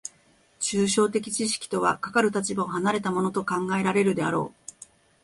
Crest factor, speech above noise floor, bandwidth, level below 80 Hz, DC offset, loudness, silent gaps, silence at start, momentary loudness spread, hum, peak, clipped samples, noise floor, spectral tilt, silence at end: 18 dB; 36 dB; 11.5 kHz; -64 dBFS; under 0.1%; -25 LUFS; none; 0.05 s; 7 LU; none; -8 dBFS; under 0.1%; -61 dBFS; -4 dB/octave; 0.75 s